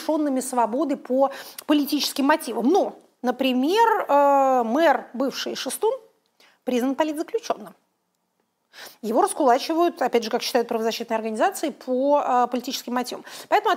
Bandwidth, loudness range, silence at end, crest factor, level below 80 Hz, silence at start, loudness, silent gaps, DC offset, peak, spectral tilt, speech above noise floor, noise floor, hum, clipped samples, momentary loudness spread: 16 kHz; 7 LU; 0 s; 16 dB; -80 dBFS; 0 s; -23 LUFS; none; under 0.1%; -6 dBFS; -3 dB/octave; 51 dB; -73 dBFS; none; under 0.1%; 10 LU